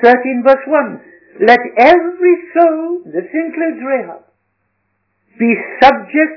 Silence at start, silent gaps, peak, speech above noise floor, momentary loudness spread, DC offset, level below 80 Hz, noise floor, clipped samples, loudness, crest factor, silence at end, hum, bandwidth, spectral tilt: 0 s; none; 0 dBFS; 54 dB; 11 LU; under 0.1%; -52 dBFS; -66 dBFS; 1%; -12 LUFS; 12 dB; 0 s; none; 5.4 kHz; -6 dB/octave